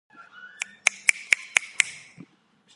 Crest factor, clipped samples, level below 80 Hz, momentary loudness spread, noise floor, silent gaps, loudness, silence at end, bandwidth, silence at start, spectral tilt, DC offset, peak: 28 dB; under 0.1%; -74 dBFS; 14 LU; -61 dBFS; none; -23 LUFS; 0.85 s; 16 kHz; 0.85 s; 2 dB/octave; under 0.1%; 0 dBFS